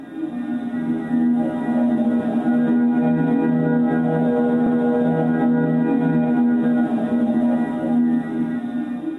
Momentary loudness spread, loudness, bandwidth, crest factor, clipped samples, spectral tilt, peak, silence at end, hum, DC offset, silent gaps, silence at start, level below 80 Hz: 6 LU; -20 LUFS; 3.9 kHz; 10 dB; under 0.1%; -9.5 dB/octave; -8 dBFS; 0 s; none; under 0.1%; none; 0 s; -58 dBFS